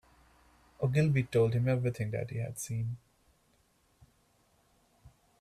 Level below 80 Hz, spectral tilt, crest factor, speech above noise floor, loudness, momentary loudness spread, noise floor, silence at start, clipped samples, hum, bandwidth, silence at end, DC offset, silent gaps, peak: -62 dBFS; -7 dB/octave; 18 dB; 40 dB; -32 LUFS; 10 LU; -70 dBFS; 0.8 s; under 0.1%; none; 14 kHz; 0.3 s; under 0.1%; none; -16 dBFS